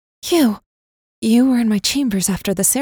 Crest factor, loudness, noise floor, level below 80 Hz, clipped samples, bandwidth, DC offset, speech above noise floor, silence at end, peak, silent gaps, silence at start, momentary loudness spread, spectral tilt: 14 dB; -17 LUFS; under -90 dBFS; -48 dBFS; under 0.1%; over 20 kHz; under 0.1%; over 74 dB; 0 s; -4 dBFS; 0.66-1.22 s; 0.25 s; 5 LU; -4 dB/octave